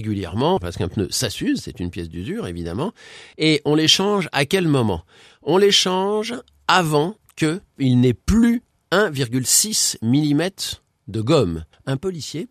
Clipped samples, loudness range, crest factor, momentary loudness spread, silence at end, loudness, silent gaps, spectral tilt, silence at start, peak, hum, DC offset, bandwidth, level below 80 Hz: under 0.1%; 3 LU; 20 dB; 14 LU; 0.05 s; -20 LUFS; none; -4 dB/octave; 0 s; 0 dBFS; none; under 0.1%; 14.5 kHz; -44 dBFS